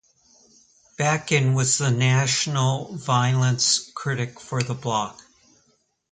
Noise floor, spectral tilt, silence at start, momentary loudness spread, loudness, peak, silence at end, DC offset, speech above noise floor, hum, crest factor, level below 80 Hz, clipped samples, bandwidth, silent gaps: -66 dBFS; -4 dB/octave; 1 s; 9 LU; -22 LUFS; -6 dBFS; 1 s; under 0.1%; 44 dB; none; 18 dB; -60 dBFS; under 0.1%; 9.6 kHz; none